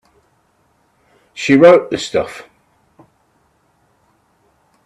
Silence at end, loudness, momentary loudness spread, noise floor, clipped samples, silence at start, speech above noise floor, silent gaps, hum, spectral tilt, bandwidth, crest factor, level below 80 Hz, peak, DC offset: 2.45 s; -12 LUFS; 25 LU; -59 dBFS; under 0.1%; 1.35 s; 48 dB; none; none; -5.5 dB/octave; 11 kHz; 18 dB; -58 dBFS; 0 dBFS; under 0.1%